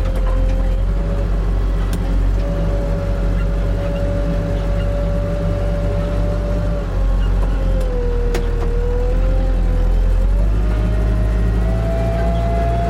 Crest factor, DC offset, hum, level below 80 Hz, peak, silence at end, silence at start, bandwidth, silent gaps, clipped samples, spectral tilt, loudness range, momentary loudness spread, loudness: 8 dB; under 0.1%; none; -18 dBFS; -8 dBFS; 0 s; 0 s; 7.4 kHz; none; under 0.1%; -8 dB/octave; 2 LU; 2 LU; -20 LUFS